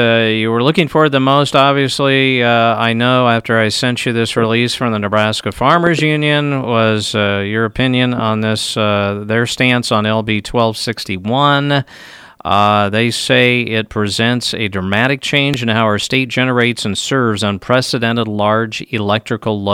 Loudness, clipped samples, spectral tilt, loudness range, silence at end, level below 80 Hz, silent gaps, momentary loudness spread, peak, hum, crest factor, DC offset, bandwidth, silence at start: -14 LUFS; under 0.1%; -5 dB/octave; 3 LU; 0 s; -46 dBFS; none; 6 LU; 0 dBFS; none; 14 dB; under 0.1%; 16 kHz; 0 s